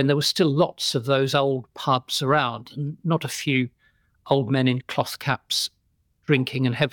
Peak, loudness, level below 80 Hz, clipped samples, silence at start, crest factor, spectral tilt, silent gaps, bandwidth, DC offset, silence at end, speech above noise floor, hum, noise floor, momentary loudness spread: -6 dBFS; -23 LUFS; -66 dBFS; under 0.1%; 0 s; 18 dB; -5 dB/octave; none; 19.5 kHz; under 0.1%; 0.05 s; 45 dB; none; -67 dBFS; 7 LU